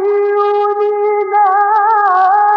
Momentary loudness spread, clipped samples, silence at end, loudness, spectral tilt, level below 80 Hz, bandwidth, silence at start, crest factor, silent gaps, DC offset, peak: 4 LU; under 0.1%; 0 s; -12 LUFS; -4 dB/octave; -76 dBFS; 5.6 kHz; 0 s; 10 dB; none; under 0.1%; -2 dBFS